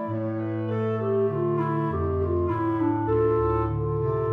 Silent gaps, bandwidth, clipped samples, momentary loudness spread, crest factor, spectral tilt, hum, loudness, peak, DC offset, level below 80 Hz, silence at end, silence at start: none; 4.1 kHz; under 0.1%; 5 LU; 12 dB; -11 dB/octave; none; -25 LUFS; -12 dBFS; under 0.1%; -42 dBFS; 0 s; 0 s